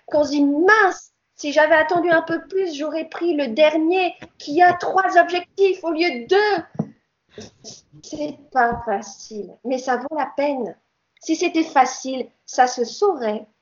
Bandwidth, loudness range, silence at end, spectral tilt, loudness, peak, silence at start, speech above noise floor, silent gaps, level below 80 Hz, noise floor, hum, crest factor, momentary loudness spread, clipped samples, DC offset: 7.6 kHz; 6 LU; 0.2 s; -4 dB/octave; -19 LUFS; 0 dBFS; 0.1 s; 30 dB; none; -58 dBFS; -49 dBFS; none; 20 dB; 16 LU; under 0.1%; under 0.1%